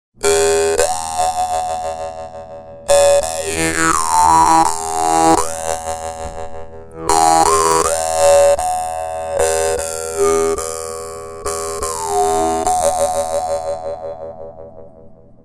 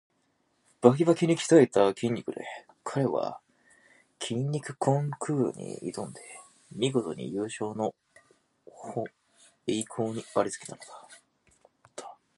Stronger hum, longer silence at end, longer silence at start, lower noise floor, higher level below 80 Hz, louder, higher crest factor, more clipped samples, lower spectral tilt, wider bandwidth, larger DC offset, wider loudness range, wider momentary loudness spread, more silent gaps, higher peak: neither; about the same, 0.3 s vs 0.25 s; second, 0.2 s vs 0.8 s; second, -40 dBFS vs -72 dBFS; first, -38 dBFS vs -72 dBFS; first, -15 LUFS vs -28 LUFS; second, 16 dB vs 26 dB; neither; second, -2.5 dB/octave vs -6 dB/octave; about the same, 11 kHz vs 11.5 kHz; neither; second, 5 LU vs 10 LU; second, 17 LU vs 23 LU; neither; first, 0 dBFS vs -4 dBFS